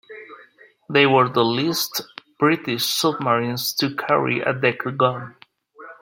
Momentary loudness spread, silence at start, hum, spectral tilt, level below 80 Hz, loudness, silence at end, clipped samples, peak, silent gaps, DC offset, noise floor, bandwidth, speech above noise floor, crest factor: 14 LU; 0.1 s; none; -4 dB/octave; -66 dBFS; -20 LUFS; 0.1 s; under 0.1%; -2 dBFS; none; under 0.1%; -51 dBFS; 16.5 kHz; 31 dB; 20 dB